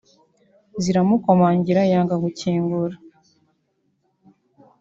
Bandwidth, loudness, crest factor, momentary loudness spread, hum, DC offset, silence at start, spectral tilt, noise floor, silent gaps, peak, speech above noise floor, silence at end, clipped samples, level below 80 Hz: 7.6 kHz; -19 LUFS; 18 dB; 10 LU; none; under 0.1%; 0.75 s; -7.5 dB/octave; -69 dBFS; none; -4 dBFS; 51 dB; 1.85 s; under 0.1%; -60 dBFS